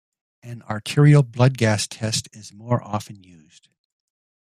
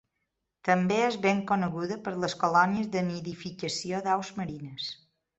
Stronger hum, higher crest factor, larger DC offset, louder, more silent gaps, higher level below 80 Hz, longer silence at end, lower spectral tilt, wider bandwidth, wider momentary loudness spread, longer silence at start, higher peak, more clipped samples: neither; about the same, 18 dB vs 20 dB; neither; first, -20 LUFS vs -29 LUFS; neither; first, -58 dBFS vs -66 dBFS; first, 1.3 s vs 0.45 s; about the same, -6 dB/octave vs -5 dB/octave; first, 13.5 kHz vs 8.2 kHz; first, 25 LU vs 12 LU; second, 0.45 s vs 0.65 s; first, -4 dBFS vs -8 dBFS; neither